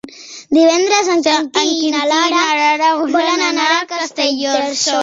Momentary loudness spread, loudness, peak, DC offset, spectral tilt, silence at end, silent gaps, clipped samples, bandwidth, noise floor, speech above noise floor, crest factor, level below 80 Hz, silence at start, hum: 5 LU; -14 LUFS; 0 dBFS; under 0.1%; -0.5 dB/octave; 0 s; none; under 0.1%; 8 kHz; -34 dBFS; 20 dB; 14 dB; -64 dBFS; 0.05 s; none